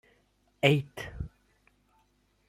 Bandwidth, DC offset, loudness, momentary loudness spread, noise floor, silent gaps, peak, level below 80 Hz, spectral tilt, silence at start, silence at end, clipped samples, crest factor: 13.5 kHz; under 0.1%; -29 LUFS; 18 LU; -70 dBFS; none; -6 dBFS; -54 dBFS; -6 dB/octave; 0.65 s; 1.2 s; under 0.1%; 28 dB